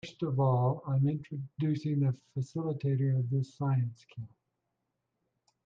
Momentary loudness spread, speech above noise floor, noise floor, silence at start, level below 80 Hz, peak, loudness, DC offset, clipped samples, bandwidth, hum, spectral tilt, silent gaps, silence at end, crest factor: 12 LU; 52 dB; -83 dBFS; 0.05 s; -70 dBFS; -18 dBFS; -32 LUFS; under 0.1%; under 0.1%; 7.2 kHz; none; -9.5 dB/octave; none; 1.4 s; 14 dB